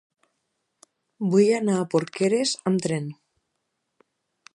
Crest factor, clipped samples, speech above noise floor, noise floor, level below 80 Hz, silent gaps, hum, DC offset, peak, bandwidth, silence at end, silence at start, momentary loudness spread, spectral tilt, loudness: 18 dB; under 0.1%; 56 dB; -78 dBFS; -74 dBFS; none; none; under 0.1%; -8 dBFS; 11.5 kHz; 1.45 s; 1.2 s; 11 LU; -5.5 dB/octave; -23 LUFS